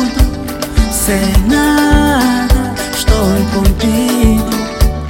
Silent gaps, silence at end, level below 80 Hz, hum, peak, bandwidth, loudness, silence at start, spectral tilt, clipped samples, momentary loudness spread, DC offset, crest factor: none; 0 s; -16 dBFS; none; 0 dBFS; 17 kHz; -12 LUFS; 0 s; -5 dB/octave; under 0.1%; 6 LU; under 0.1%; 12 dB